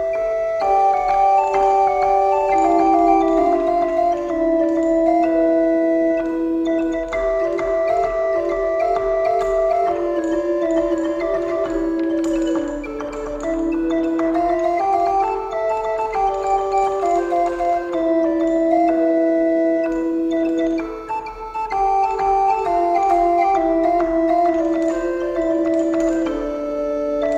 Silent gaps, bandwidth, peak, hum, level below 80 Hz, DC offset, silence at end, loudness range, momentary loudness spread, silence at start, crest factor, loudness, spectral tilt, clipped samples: none; 8.2 kHz; -4 dBFS; none; -42 dBFS; under 0.1%; 0 s; 4 LU; 6 LU; 0 s; 14 dB; -19 LUFS; -6 dB/octave; under 0.1%